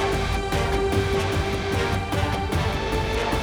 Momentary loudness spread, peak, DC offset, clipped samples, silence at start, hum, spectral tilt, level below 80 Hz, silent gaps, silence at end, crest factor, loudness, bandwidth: 2 LU; -10 dBFS; under 0.1%; under 0.1%; 0 s; none; -5.5 dB/octave; -30 dBFS; none; 0 s; 14 dB; -24 LUFS; over 20 kHz